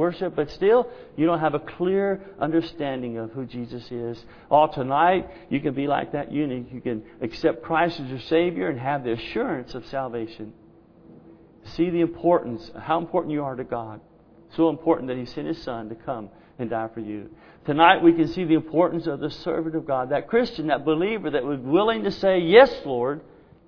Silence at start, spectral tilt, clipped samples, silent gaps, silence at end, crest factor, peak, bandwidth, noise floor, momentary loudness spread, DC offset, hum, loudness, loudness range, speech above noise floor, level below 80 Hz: 0 s; -8 dB/octave; under 0.1%; none; 0.45 s; 24 dB; 0 dBFS; 5.4 kHz; -51 dBFS; 14 LU; under 0.1%; none; -24 LUFS; 7 LU; 27 dB; -54 dBFS